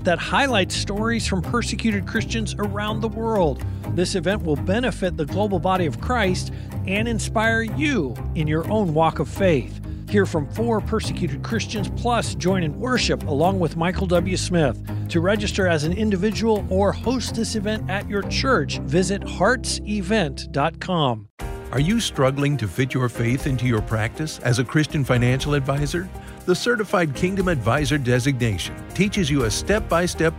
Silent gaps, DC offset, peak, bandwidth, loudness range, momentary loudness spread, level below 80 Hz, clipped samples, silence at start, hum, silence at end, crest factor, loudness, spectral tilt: 21.30-21.37 s; under 0.1%; -6 dBFS; 16 kHz; 2 LU; 5 LU; -34 dBFS; under 0.1%; 0 s; none; 0 s; 16 dB; -22 LUFS; -5.5 dB/octave